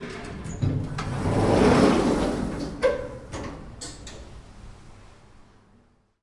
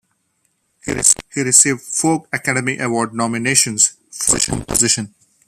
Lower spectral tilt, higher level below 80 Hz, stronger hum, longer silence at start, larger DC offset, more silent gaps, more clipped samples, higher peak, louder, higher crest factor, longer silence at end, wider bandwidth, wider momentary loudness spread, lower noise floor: first, -6.5 dB/octave vs -2 dB/octave; about the same, -40 dBFS vs -44 dBFS; neither; second, 0 s vs 0.85 s; neither; neither; neither; second, -8 dBFS vs 0 dBFS; second, -24 LUFS vs -15 LUFS; about the same, 20 dB vs 18 dB; first, 1.15 s vs 0.4 s; second, 11.5 kHz vs over 20 kHz; first, 22 LU vs 9 LU; second, -60 dBFS vs -66 dBFS